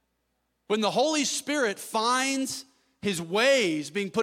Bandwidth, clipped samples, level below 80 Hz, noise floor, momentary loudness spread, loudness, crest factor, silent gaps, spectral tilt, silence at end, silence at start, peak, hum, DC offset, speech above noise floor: 16.5 kHz; under 0.1%; -72 dBFS; -76 dBFS; 9 LU; -26 LUFS; 18 dB; none; -2.5 dB/octave; 0 s; 0.7 s; -8 dBFS; none; under 0.1%; 50 dB